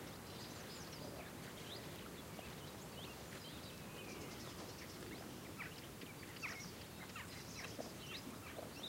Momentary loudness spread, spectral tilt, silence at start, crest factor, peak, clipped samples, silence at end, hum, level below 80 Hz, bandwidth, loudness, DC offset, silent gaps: 3 LU; -3.5 dB/octave; 0 s; 18 dB; -32 dBFS; under 0.1%; 0 s; none; -68 dBFS; 16 kHz; -50 LUFS; under 0.1%; none